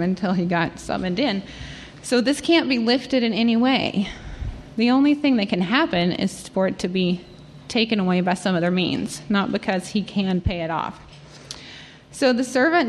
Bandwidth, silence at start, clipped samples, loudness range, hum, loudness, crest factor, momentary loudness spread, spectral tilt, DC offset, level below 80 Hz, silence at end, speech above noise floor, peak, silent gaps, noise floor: 12.5 kHz; 0 s; under 0.1%; 4 LU; none; -21 LUFS; 18 dB; 16 LU; -5.5 dB/octave; under 0.1%; -44 dBFS; 0 s; 21 dB; -4 dBFS; none; -42 dBFS